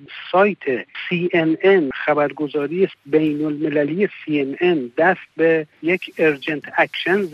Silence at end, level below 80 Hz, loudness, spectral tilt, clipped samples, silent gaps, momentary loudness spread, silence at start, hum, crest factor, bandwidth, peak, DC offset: 0 s; -66 dBFS; -19 LUFS; -7.5 dB/octave; under 0.1%; none; 6 LU; 0 s; none; 16 dB; 6.4 kHz; -4 dBFS; under 0.1%